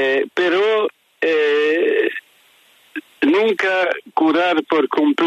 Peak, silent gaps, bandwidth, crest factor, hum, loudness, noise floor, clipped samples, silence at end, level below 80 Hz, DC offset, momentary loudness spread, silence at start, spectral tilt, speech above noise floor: -4 dBFS; none; 10.5 kHz; 14 dB; none; -17 LUFS; -53 dBFS; under 0.1%; 0 s; -74 dBFS; under 0.1%; 8 LU; 0 s; -4.5 dB/octave; 37 dB